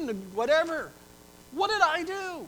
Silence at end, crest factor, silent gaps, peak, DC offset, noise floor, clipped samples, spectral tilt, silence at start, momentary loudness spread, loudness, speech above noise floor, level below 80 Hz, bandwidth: 0 s; 20 dB; none; -8 dBFS; under 0.1%; -52 dBFS; under 0.1%; -3 dB/octave; 0 s; 13 LU; -27 LUFS; 25 dB; -62 dBFS; over 20 kHz